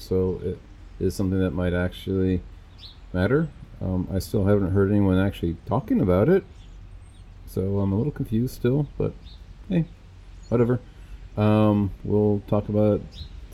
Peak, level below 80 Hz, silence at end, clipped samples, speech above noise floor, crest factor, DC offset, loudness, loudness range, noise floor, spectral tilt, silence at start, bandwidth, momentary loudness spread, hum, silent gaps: -8 dBFS; -42 dBFS; 0 s; under 0.1%; 21 dB; 16 dB; under 0.1%; -24 LUFS; 4 LU; -44 dBFS; -8.5 dB/octave; 0 s; 14.5 kHz; 13 LU; none; none